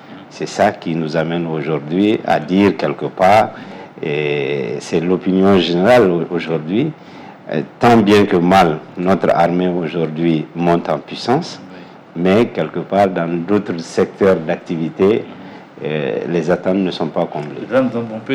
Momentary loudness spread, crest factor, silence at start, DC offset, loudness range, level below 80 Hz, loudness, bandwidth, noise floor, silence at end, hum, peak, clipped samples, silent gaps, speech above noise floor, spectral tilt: 12 LU; 12 dB; 0.05 s; under 0.1%; 4 LU; -50 dBFS; -16 LUFS; 14 kHz; -37 dBFS; 0 s; none; -4 dBFS; under 0.1%; none; 21 dB; -6.5 dB/octave